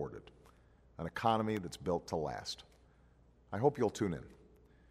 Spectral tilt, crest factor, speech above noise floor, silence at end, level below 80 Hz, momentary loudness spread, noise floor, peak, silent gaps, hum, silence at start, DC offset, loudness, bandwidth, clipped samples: -6 dB/octave; 22 dB; 29 dB; 0.55 s; -62 dBFS; 15 LU; -65 dBFS; -16 dBFS; none; none; 0 s; under 0.1%; -37 LUFS; 15.5 kHz; under 0.1%